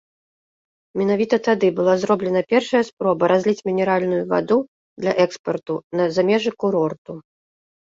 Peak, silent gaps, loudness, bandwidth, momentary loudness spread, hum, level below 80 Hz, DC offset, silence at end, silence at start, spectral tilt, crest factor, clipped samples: -2 dBFS; 2.93-2.97 s, 4.68-4.96 s, 5.39-5.44 s, 5.84-5.91 s, 6.98-7.05 s; -20 LUFS; 7.8 kHz; 9 LU; none; -64 dBFS; under 0.1%; 0.75 s; 0.95 s; -6 dB/octave; 18 dB; under 0.1%